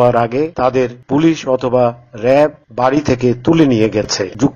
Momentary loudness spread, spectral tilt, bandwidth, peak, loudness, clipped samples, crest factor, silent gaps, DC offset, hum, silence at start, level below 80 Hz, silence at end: 5 LU; -6 dB/octave; 7.4 kHz; 0 dBFS; -14 LUFS; under 0.1%; 14 dB; none; under 0.1%; none; 0 s; -42 dBFS; 0 s